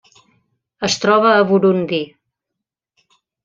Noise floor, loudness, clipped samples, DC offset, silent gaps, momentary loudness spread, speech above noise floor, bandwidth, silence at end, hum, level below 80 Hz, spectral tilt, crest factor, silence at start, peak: -82 dBFS; -15 LUFS; under 0.1%; under 0.1%; none; 11 LU; 67 dB; 7.6 kHz; 1.4 s; none; -62 dBFS; -4.5 dB/octave; 16 dB; 0.8 s; -2 dBFS